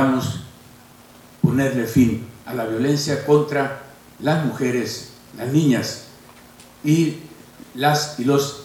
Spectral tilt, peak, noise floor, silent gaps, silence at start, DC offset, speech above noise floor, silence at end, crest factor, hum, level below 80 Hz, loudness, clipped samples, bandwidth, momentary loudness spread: -5.5 dB/octave; -4 dBFS; -46 dBFS; none; 0 s; under 0.1%; 27 dB; 0 s; 18 dB; none; -54 dBFS; -21 LUFS; under 0.1%; 18 kHz; 15 LU